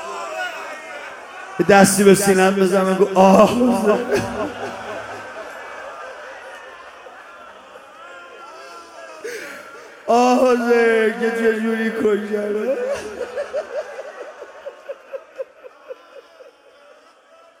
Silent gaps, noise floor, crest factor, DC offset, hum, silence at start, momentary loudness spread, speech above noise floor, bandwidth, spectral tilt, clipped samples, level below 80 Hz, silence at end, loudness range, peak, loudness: none; -50 dBFS; 20 dB; under 0.1%; none; 0 s; 25 LU; 34 dB; 16.5 kHz; -5 dB/octave; under 0.1%; -56 dBFS; 1.4 s; 22 LU; 0 dBFS; -17 LUFS